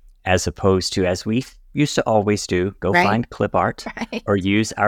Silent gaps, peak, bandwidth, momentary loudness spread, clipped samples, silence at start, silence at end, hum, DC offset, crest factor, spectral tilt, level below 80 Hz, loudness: none; -2 dBFS; 17 kHz; 7 LU; under 0.1%; 0.25 s; 0 s; none; under 0.1%; 18 dB; -5 dB/octave; -44 dBFS; -20 LUFS